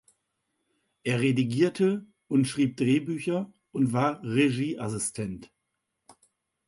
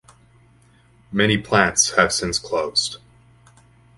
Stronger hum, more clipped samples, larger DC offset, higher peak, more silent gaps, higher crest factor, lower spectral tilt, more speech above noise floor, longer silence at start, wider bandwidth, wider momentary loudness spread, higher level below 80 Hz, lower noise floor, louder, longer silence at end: neither; neither; neither; second, -12 dBFS vs 0 dBFS; neither; second, 16 dB vs 22 dB; first, -6 dB/octave vs -2.5 dB/octave; first, 55 dB vs 35 dB; about the same, 1.05 s vs 1.1 s; about the same, 11.5 kHz vs 12 kHz; about the same, 11 LU vs 11 LU; second, -64 dBFS vs -48 dBFS; first, -81 dBFS vs -54 dBFS; second, -27 LUFS vs -19 LUFS; first, 1.25 s vs 1 s